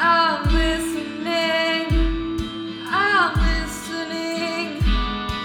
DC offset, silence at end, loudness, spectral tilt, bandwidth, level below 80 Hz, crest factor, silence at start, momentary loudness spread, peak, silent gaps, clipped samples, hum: under 0.1%; 0 s; -22 LUFS; -5 dB/octave; 16 kHz; -26 dBFS; 16 dB; 0 s; 10 LU; -6 dBFS; none; under 0.1%; none